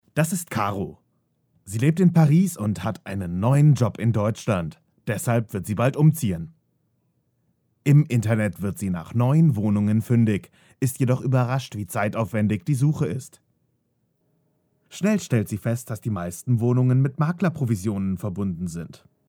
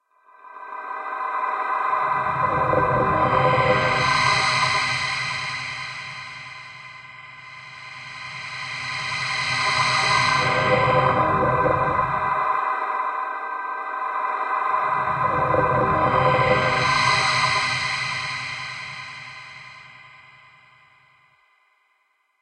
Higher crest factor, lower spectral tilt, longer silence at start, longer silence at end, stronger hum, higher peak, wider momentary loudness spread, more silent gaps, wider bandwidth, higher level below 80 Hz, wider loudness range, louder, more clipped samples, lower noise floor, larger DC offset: about the same, 18 dB vs 18 dB; first, -7.5 dB/octave vs -4 dB/octave; second, 0.15 s vs 0.45 s; second, 0.35 s vs 2.25 s; neither; about the same, -6 dBFS vs -6 dBFS; second, 11 LU vs 18 LU; neither; first, 18.5 kHz vs 10.5 kHz; second, -56 dBFS vs -50 dBFS; second, 6 LU vs 12 LU; about the same, -23 LUFS vs -21 LUFS; neither; first, -71 dBFS vs -67 dBFS; neither